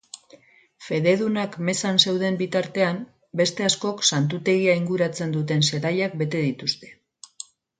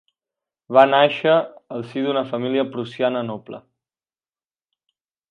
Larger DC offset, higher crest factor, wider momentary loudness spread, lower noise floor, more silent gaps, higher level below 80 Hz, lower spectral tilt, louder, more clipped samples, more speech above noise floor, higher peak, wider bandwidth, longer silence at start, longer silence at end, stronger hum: neither; about the same, 22 dB vs 22 dB; second, 13 LU vs 17 LU; second, -53 dBFS vs under -90 dBFS; neither; first, -66 dBFS vs -76 dBFS; second, -4 dB/octave vs -7 dB/octave; second, -23 LUFS vs -19 LUFS; neither; second, 31 dB vs over 71 dB; about the same, -2 dBFS vs 0 dBFS; first, 9.6 kHz vs 6.6 kHz; second, 0.15 s vs 0.7 s; second, 0.85 s vs 1.7 s; neither